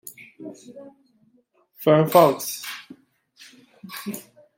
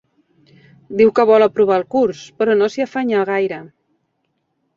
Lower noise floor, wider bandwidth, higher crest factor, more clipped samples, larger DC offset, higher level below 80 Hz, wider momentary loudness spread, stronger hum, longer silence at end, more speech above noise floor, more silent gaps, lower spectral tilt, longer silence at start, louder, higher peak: second, -63 dBFS vs -69 dBFS; first, 16.5 kHz vs 7.4 kHz; first, 22 dB vs 16 dB; neither; neither; second, -72 dBFS vs -60 dBFS; first, 25 LU vs 9 LU; neither; second, 0.35 s vs 1.1 s; second, 43 dB vs 54 dB; neither; about the same, -5.5 dB/octave vs -6 dB/octave; second, 0.05 s vs 0.9 s; second, -20 LUFS vs -16 LUFS; about the same, -2 dBFS vs -2 dBFS